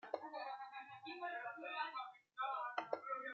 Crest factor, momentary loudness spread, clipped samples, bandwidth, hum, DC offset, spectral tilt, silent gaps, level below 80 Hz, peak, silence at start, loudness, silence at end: 24 dB; 8 LU; under 0.1%; 7.6 kHz; none; under 0.1%; 0.5 dB/octave; none; under -90 dBFS; -24 dBFS; 0.05 s; -47 LUFS; 0 s